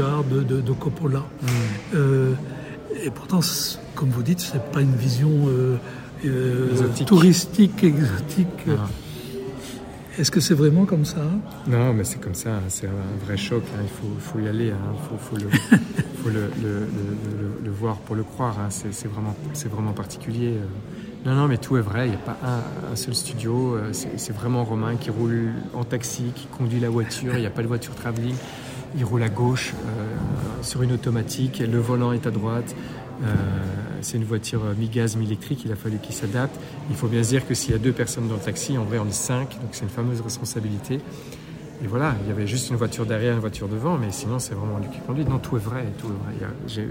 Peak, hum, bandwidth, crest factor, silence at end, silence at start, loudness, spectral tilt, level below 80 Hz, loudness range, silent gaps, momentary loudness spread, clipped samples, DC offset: -2 dBFS; none; 16.5 kHz; 22 dB; 0 s; 0 s; -24 LUFS; -6 dB/octave; -48 dBFS; 7 LU; none; 11 LU; under 0.1%; under 0.1%